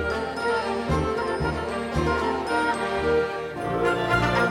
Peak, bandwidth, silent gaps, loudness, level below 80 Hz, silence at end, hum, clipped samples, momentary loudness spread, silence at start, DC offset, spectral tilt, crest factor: -8 dBFS; 16.5 kHz; none; -25 LUFS; -40 dBFS; 0 s; none; under 0.1%; 5 LU; 0 s; under 0.1%; -6 dB/octave; 16 dB